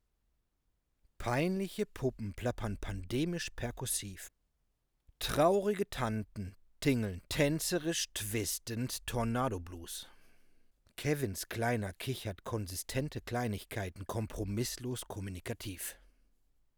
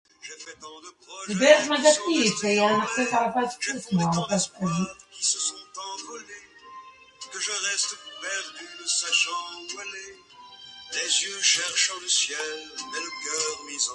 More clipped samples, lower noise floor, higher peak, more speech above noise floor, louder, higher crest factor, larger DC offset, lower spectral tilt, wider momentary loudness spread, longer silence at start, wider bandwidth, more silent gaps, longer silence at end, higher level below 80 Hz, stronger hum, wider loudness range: neither; first, -79 dBFS vs -47 dBFS; second, -16 dBFS vs -4 dBFS; first, 44 dB vs 21 dB; second, -36 LUFS vs -24 LUFS; about the same, 22 dB vs 22 dB; neither; first, -4.5 dB/octave vs -2.5 dB/octave; second, 11 LU vs 22 LU; first, 1.2 s vs 0.25 s; first, over 20 kHz vs 11.5 kHz; neither; first, 0.8 s vs 0 s; first, -54 dBFS vs -68 dBFS; neither; second, 5 LU vs 8 LU